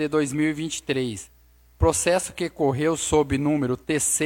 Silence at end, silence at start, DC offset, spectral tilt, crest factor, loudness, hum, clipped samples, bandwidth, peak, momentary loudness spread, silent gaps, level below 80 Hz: 0 s; 0 s; under 0.1%; -4.5 dB/octave; 18 dB; -24 LUFS; none; under 0.1%; 17 kHz; -6 dBFS; 7 LU; none; -42 dBFS